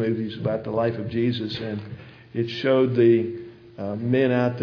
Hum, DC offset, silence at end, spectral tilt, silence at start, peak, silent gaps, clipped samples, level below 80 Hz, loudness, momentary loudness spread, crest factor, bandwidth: none; under 0.1%; 0 s; -8.5 dB/octave; 0 s; -8 dBFS; none; under 0.1%; -58 dBFS; -23 LUFS; 16 LU; 16 dB; 5.4 kHz